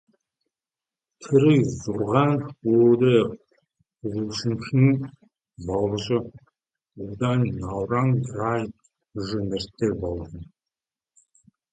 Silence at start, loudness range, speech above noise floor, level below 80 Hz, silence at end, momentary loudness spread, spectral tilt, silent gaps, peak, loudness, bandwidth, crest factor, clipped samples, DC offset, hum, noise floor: 1.2 s; 6 LU; over 68 dB; -50 dBFS; 1.3 s; 19 LU; -7.5 dB/octave; none; -4 dBFS; -23 LUFS; 9 kHz; 20 dB; under 0.1%; under 0.1%; none; under -90 dBFS